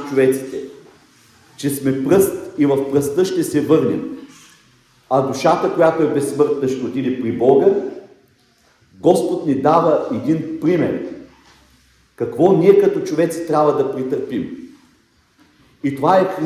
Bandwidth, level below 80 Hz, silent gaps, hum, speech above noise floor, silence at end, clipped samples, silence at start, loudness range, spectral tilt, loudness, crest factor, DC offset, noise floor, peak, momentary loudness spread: 15 kHz; -58 dBFS; none; none; 41 dB; 0 s; under 0.1%; 0 s; 2 LU; -6.5 dB/octave; -17 LUFS; 18 dB; under 0.1%; -56 dBFS; 0 dBFS; 12 LU